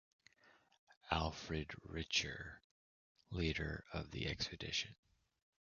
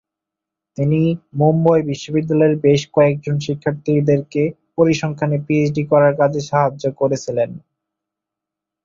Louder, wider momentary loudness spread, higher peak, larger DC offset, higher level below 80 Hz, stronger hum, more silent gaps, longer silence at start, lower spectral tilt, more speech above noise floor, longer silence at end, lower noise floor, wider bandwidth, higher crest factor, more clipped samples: second, -42 LUFS vs -17 LUFS; first, 12 LU vs 7 LU; second, -18 dBFS vs -2 dBFS; neither; about the same, -56 dBFS vs -56 dBFS; neither; first, 0.79-0.87 s, 0.97-1.01 s, 2.64-3.15 s vs none; second, 0.45 s vs 0.8 s; second, -3 dB/octave vs -7.5 dB/octave; second, 28 dB vs 68 dB; second, 0.7 s vs 1.25 s; second, -71 dBFS vs -84 dBFS; about the same, 7 kHz vs 7.6 kHz; first, 28 dB vs 16 dB; neither